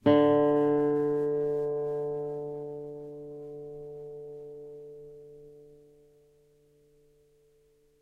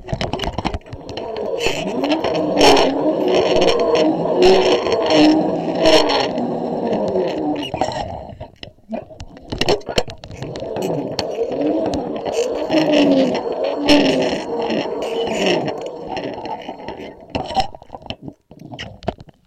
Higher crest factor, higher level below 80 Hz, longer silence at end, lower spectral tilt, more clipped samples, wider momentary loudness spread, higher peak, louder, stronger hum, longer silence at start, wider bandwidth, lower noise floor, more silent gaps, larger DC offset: about the same, 20 dB vs 16 dB; second, -66 dBFS vs -40 dBFS; first, 2.35 s vs 0.15 s; first, -9 dB/octave vs -4.5 dB/octave; neither; first, 23 LU vs 19 LU; second, -12 dBFS vs -2 dBFS; second, -28 LUFS vs -18 LUFS; neither; about the same, 0.05 s vs 0 s; second, 4.7 kHz vs 15 kHz; first, -65 dBFS vs -38 dBFS; neither; neither